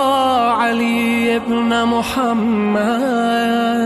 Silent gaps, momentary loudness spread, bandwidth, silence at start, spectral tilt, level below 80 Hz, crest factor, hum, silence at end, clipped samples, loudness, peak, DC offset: none; 2 LU; 13.5 kHz; 0 s; -5 dB/octave; -50 dBFS; 8 dB; none; 0 s; under 0.1%; -16 LUFS; -6 dBFS; under 0.1%